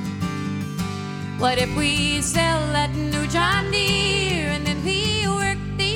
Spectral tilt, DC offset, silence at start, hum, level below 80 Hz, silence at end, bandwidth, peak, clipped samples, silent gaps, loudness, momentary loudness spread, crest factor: -4 dB/octave; under 0.1%; 0 s; none; -36 dBFS; 0 s; 18 kHz; -6 dBFS; under 0.1%; none; -21 LUFS; 8 LU; 16 dB